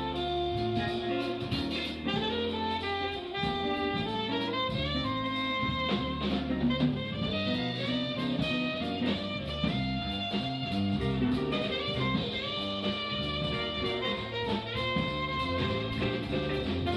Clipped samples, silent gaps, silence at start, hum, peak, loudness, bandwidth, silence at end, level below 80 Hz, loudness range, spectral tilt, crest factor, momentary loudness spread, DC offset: under 0.1%; none; 0 s; none; -16 dBFS; -31 LUFS; 12 kHz; 0 s; -48 dBFS; 1 LU; -6.5 dB/octave; 16 dB; 2 LU; under 0.1%